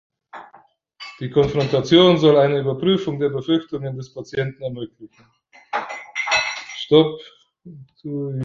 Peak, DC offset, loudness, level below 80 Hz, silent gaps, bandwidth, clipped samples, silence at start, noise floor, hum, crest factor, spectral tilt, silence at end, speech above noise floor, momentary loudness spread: -2 dBFS; under 0.1%; -19 LUFS; -54 dBFS; none; 7.6 kHz; under 0.1%; 0.35 s; -53 dBFS; none; 18 dB; -6 dB/octave; 0 s; 34 dB; 22 LU